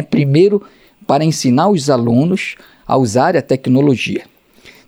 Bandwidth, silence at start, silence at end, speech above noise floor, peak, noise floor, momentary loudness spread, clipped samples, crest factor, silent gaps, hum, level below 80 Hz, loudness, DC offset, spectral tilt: 15 kHz; 0 s; 0.65 s; 31 dB; -2 dBFS; -44 dBFS; 9 LU; under 0.1%; 14 dB; none; none; -52 dBFS; -14 LUFS; under 0.1%; -6.5 dB/octave